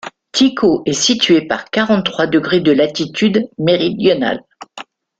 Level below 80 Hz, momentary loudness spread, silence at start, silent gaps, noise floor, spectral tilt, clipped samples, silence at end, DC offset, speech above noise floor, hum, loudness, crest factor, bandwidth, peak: -54 dBFS; 8 LU; 0.05 s; none; -36 dBFS; -4 dB/octave; under 0.1%; 0.35 s; under 0.1%; 23 dB; none; -14 LUFS; 14 dB; 9.2 kHz; 0 dBFS